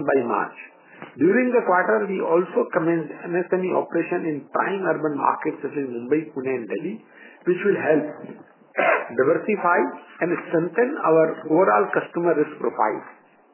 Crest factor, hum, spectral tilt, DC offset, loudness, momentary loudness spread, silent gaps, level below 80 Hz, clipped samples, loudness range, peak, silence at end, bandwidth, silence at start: 18 dB; none; -10.5 dB/octave; under 0.1%; -22 LUFS; 10 LU; none; -78 dBFS; under 0.1%; 4 LU; -4 dBFS; 0.4 s; 3.2 kHz; 0 s